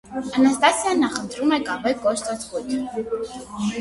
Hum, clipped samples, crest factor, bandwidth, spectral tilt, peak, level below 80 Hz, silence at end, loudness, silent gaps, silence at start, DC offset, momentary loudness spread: none; under 0.1%; 20 dB; 11.5 kHz; -3.5 dB/octave; -2 dBFS; -54 dBFS; 0 s; -22 LUFS; none; 0.05 s; under 0.1%; 11 LU